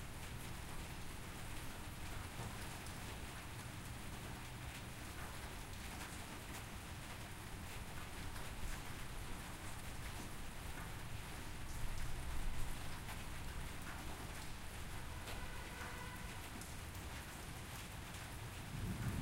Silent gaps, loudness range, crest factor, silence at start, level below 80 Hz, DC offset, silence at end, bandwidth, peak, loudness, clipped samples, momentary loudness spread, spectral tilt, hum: none; 1 LU; 18 dB; 0 s; -50 dBFS; under 0.1%; 0 s; 16 kHz; -28 dBFS; -49 LUFS; under 0.1%; 2 LU; -4 dB/octave; none